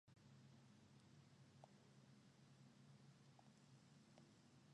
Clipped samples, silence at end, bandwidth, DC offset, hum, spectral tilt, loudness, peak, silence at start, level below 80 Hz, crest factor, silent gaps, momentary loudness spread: under 0.1%; 0 s; 10.5 kHz; under 0.1%; none; -5.5 dB/octave; -69 LUFS; -50 dBFS; 0.05 s; under -90 dBFS; 20 dB; none; 1 LU